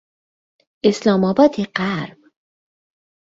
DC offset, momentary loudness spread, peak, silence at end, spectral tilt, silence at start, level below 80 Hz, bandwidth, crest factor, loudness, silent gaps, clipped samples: under 0.1%; 10 LU; -2 dBFS; 1.15 s; -6.5 dB/octave; 0.85 s; -60 dBFS; 8 kHz; 18 dB; -18 LUFS; none; under 0.1%